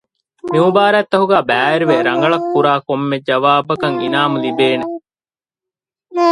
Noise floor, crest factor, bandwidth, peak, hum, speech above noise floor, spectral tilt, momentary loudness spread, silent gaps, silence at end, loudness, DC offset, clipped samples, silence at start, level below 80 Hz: under -90 dBFS; 14 dB; 11.5 kHz; 0 dBFS; none; over 76 dB; -6.5 dB/octave; 7 LU; none; 0 s; -14 LUFS; under 0.1%; under 0.1%; 0.45 s; -62 dBFS